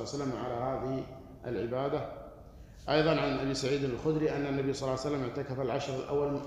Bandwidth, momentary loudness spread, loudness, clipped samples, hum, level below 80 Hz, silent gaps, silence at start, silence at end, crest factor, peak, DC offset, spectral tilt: 13 kHz; 16 LU; -33 LUFS; under 0.1%; none; -54 dBFS; none; 0 s; 0 s; 20 dB; -14 dBFS; under 0.1%; -6 dB/octave